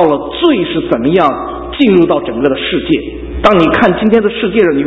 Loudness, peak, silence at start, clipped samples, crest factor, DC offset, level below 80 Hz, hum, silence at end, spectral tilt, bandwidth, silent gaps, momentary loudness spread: -11 LUFS; 0 dBFS; 0 s; 0.4%; 10 dB; under 0.1%; -32 dBFS; none; 0 s; -7.5 dB/octave; 7.8 kHz; none; 7 LU